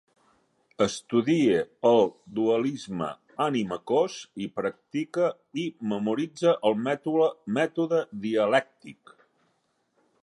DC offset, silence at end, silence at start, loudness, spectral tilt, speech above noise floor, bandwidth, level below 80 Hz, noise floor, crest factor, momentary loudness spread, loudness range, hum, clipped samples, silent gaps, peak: under 0.1%; 1.3 s; 0.8 s; -26 LUFS; -5.5 dB/octave; 46 dB; 11.5 kHz; -70 dBFS; -72 dBFS; 20 dB; 10 LU; 3 LU; none; under 0.1%; none; -8 dBFS